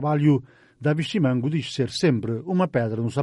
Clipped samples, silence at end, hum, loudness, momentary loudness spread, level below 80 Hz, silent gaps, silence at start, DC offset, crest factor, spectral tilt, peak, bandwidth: under 0.1%; 0 s; none; -23 LUFS; 5 LU; -60 dBFS; none; 0 s; under 0.1%; 14 dB; -7 dB/octave; -8 dBFS; 11.5 kHz